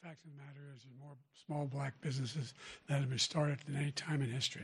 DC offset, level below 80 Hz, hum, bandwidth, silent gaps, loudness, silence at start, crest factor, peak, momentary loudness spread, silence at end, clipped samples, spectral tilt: under 0.1%; -74 dBFS; none; 11.5 kHz; none; -39 LUFS; 0.05 s; 18 dB; -22 dBFS; 21 LU; 0 s; under 0.1%; -4.5 dB/octave